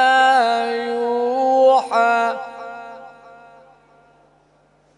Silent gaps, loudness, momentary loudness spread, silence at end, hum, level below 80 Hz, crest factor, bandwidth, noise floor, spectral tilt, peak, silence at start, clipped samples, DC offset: none; -17 LUFS; 20 LU; 1.85 s; 50 Hz at -65 dBFS; -70 dBFS; 16 dB; 10.5 kHz; -57 dBFS; -2.5 dB/octave; -2 dBFS; 0 s; under 0.1%; under 0.1%